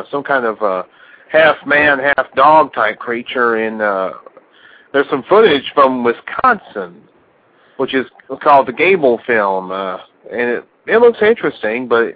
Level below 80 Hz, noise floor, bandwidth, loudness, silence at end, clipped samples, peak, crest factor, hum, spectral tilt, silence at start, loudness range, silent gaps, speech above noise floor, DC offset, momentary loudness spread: -56 dBFS; -52 dBFS; 5.2 kHz; -14 LUFS; 0.05 s; under 0.1%; 0 dBFS; 14 dB; none; -8 dB/octave; 0 s; 2 LU; none; 38 dB; under 0.1%; 13 LU